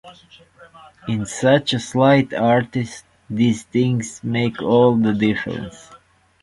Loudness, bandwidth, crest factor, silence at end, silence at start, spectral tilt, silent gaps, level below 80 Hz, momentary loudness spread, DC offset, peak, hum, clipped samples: -19 LUFS; 11.5 kHz; 18 dB; 0.45 s; 0.05 s; -6 dB/octave; none; -52 dBFS; 15 LU; under 0.1%; -2 dBFS; none; under 0.1%